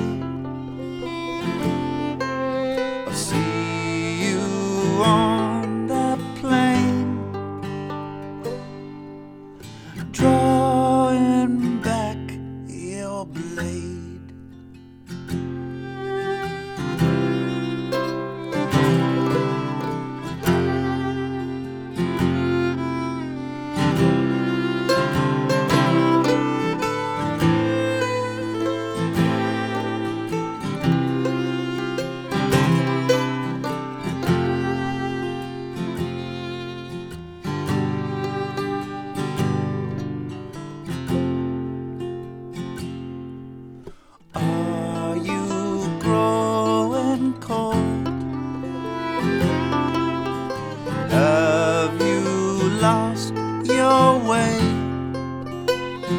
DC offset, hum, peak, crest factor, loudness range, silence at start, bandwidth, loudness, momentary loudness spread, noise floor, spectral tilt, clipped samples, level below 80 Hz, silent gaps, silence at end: under 0.1%; none; -4 dBFS; 20 dB; 8 LU; 0 s; 18 kHz; -23 LUFS; 14 LU; -43 dBFS; -6 dB/octave; under 0.1%; -48 dBFS; none; 0 s